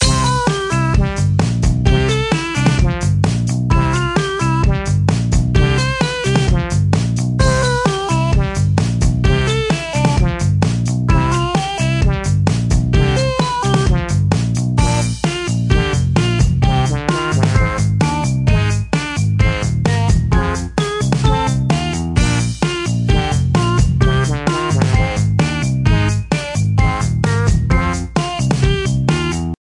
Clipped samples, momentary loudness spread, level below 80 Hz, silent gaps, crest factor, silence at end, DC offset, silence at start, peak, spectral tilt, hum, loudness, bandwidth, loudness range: under 0.1%; 3 LU; -22 dBFS; none; 14 dB; 0.05 s; under 0.1%; 0 s; 0 dBFS; -5.5 dB/octave; none; -16 LUFS; 11.5 kHz; 1 LU